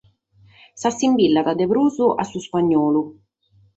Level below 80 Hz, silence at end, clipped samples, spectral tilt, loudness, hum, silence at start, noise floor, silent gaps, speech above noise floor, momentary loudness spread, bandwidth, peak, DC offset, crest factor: -60 dBFS; 0.65 s; under 0.1%; -5.5 dB/octave; -19 LUFS; none; 0.75 s; -58 dBFS; none; 39 dB; 8 LU; 8.2 kHz; -6 dBFS; under 0.1%; 14 dB